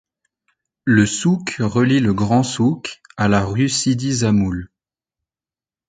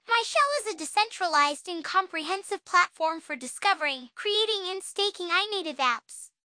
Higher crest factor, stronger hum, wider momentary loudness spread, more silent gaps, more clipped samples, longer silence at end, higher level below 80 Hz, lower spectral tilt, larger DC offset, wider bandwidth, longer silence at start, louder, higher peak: about the same, 18 dB vs 18 dB; neither; about the same, 8 LU vs 9 LU; neither; neither; first, 1.25 s vs 0.25 s; first, -44 dBFS vs -84 dBFS; first, -5.5 dB/octave vs 1 dB/octave; neither; second, 9.4 kHz vs 10.5 kHz; first, 0.85 s vs 0.1 s; first, -18 LUFS vs -27 LUFS; first, 0 dBFS vs -10 dBFS